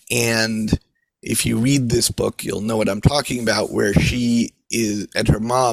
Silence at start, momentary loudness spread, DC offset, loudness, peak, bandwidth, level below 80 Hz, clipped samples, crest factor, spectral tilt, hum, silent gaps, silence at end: 0.1 s; 6 LU; under 0.1%; -19 LUFS; 0 dBFS; 16 kHz; -36 dBFS; under 0.1%; 18 dB; -4.5 dB/octave; none; none; 0 s